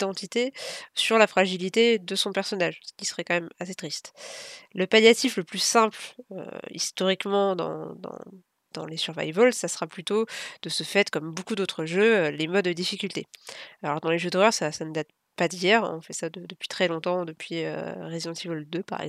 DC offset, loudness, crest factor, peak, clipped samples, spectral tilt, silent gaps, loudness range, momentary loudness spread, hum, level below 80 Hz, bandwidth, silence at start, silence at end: under 0.1%; -25 LUFS; 22 dB; -4 dBFS; under 0.1%; -3.5 dB/octave; none; 4 LU; 17 LU; none; -80 dBFS; 15 kHz; 0 s; 0 s